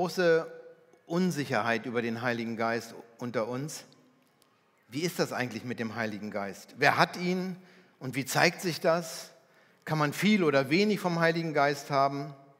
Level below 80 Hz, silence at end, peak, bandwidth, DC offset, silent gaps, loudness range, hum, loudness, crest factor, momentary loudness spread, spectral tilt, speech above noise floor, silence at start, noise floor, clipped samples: -86 dBFS; 0.2 s; -6 dBFS; 16 kHz; under 0.1%; none; 7 LU; none; -29 LUFS; 24 dB; 15 LU; -5 dB/octave; 37 dB; 0 s; -67 dBFS; under 0.1%